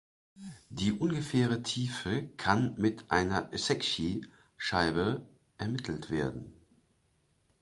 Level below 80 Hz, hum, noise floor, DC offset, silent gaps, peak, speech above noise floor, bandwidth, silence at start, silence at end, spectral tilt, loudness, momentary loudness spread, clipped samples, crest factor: -56 dBFS; none; -72 dBFS; under 0.1%; none; -8 dBFS; 41 dB; 11.5 kHz; 0.35 s; 1.1 s; -5 dB/octave; -32 LUFS; 11 LU; under 0.1%; 24 dB